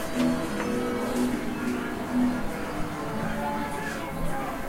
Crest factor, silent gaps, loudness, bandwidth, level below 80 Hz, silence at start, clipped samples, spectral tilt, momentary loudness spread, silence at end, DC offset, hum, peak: 14 dB; none; -29 LUFS; 16 kHz; -42 dBFS; 0 s; under 0.1%; -5.5 dB/octave; 6 LU; 0 s; under 0.1%; none; -14 dBFS